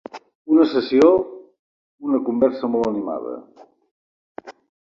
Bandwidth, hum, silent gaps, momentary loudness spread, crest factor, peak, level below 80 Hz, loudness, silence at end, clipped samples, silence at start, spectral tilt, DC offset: 7.4 kHz; none; 0.35-0.45 s, 1.59-1.98 s, 3.91-4.35 s; 24 LU; 18 dB; -2 dBFS; -60 dBFS; -19 LUFS; 0.35 s; under 0.1%; 0.15 s; -6.5 dB/octave; under 0.1%